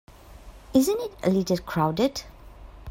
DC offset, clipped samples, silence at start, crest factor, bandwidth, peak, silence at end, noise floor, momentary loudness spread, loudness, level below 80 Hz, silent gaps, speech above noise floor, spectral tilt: under 0.1%; under 0.1%; 0.3 s; 18 dB; 16 kHz; -8 dBFS; 0 s; -46 dBFS; 6 LU; -25 LUFS; -48 dBFS; none; 22 dB; -6 dB/octave